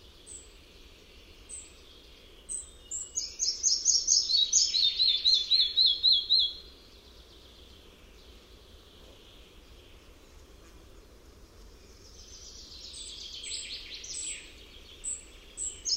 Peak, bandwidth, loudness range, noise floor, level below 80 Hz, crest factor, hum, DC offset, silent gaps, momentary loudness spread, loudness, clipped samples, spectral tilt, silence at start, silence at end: -10 dBFS; 16 kHz; 19 LU; -53 dBFS; -56 dBFS; 24 dB; none; under 0.1%; none; 25 LU; -25 LUFS; under 0.1%; 2 dB/octave; 0.05 s; 0 s